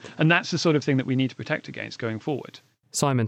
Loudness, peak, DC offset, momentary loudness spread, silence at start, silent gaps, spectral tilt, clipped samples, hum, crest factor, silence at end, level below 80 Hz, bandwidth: -25 LUFS; -6 dBFS; under 0.1%; 11 LU; 0.05 s; none; -5 dB/octave; under 0.1%; none; 20 dB; 0 s; -70 dBFS; 15.5 kHz